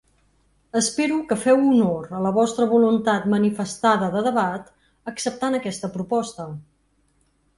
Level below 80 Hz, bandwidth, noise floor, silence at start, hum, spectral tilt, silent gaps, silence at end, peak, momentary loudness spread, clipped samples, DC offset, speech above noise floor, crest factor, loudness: -60 dBFS; 11.5 kHz; -65 dBFS; 0.75 s; none; -5 dB/octave; none; 0.95 s; -6 dBFS; 14 LU; under 0.1%; under 0.1%; 44 dB; 16 dB; -21 LUFS